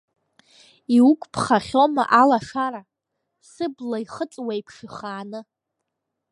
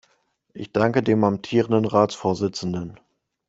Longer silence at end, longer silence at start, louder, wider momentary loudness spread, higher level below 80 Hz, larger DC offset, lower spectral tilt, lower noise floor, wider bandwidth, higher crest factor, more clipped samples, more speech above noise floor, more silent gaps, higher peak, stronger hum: first, 0.9 s vs 0.55 s; first, 0.9 s vs 0.55 s; about the same, -21 LUFS vs -22 LUFS; first, 20 LU vs 11 LU; about the same, -62 dBFS vs -58 dBFS; neither; about the same, -5.5 dB/octave vs -6.5 dB/octave; first, -81 dBFS vs -66 dBFS; first, 11 kHz vs 8 kHz; about the same, 20 dB vs 20 dB; neither; first, 60 dB vs 45 dB; neither; about the same, -2 dBFS vs -2 dBFS; neither